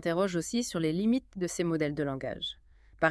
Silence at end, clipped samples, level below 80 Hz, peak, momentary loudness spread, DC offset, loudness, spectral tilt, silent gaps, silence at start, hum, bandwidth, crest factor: 0 s; under 0.1%; -58 dBFS; -10 dBFS; 7 LU; under 0.1%; -31 LUFS; -5 dB/octave; none; 0 s; none; 12 kHz; 20 dB